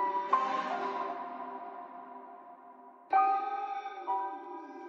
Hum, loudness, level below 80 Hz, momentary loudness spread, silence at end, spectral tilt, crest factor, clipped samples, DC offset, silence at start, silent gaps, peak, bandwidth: none; -33 LUFS; under -90 dBFS; 22 LU; 0 s; -4 dB/octave; 20 dB; under 0.1%; under 0.1%; 0 s; none; -14 dBFS; 7.4 kHz